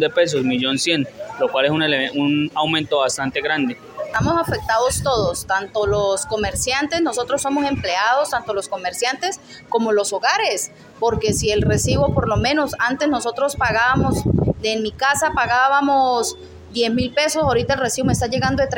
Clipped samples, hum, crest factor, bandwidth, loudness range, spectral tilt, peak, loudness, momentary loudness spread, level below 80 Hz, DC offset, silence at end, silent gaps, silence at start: under 0.1%; none; 14 dB; 17 kHz; 2 LU; -4 dB/octave; -4 dBFS; -19 LUFS; 6 LU; -40 dBFS; under 0.1%; 0 s; none; 0 s